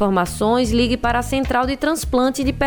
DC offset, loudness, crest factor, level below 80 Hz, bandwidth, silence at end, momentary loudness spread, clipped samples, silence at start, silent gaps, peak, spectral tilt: under 0.1%; -19 LUFS; 14 dB; -32 dBFS; over 20 kHz; 0 s; 3 LU; under 0.1%; 0 s; none; -4 dBFS; -5 dB/octave